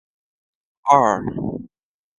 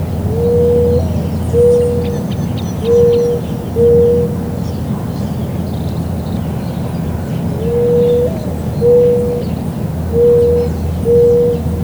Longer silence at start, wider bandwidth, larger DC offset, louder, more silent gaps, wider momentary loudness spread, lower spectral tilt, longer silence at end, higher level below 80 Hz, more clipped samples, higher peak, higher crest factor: first, 0.85 s vs 0 s; second, 11 kHz vs over 20 kHz; neither; second, -19 LUFS vs -14 LUFS; neither; first, 14 LU vs 10 LU; second, -6 dB/octave vs -8.5 dB/octave; first, 0.5 s vs 0 s; second, -52 dBFS vs -28 dBFS; neither; about the same, 0 dBFS vs 0 dBFS; first, 22 dB vs 12 dB